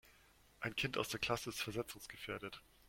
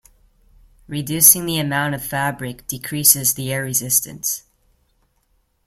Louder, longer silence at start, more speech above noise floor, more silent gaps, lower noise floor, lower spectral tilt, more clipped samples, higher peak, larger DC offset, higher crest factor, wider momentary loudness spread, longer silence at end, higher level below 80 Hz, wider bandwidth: second, -42 LUFS vs -16 LUFS; second, 0.05 s vs 0.9 s; second, 25 dB vs 45 dB; neither; first, -68 dBFS vs -64 dBFS; about the same, -3.5 dB/octave vs -2.5 dB/octave; neither; second, -22 dBFS vs 0 dBFS; neither; about the same, 22 dB vs 22 dB; second, 9 LU vs 18 LU; second, 0.3 s vs 1.3 s; second, -66 dBFS vs -52 dBFS; about the same, 16.5 kHz vs 16.5 kHz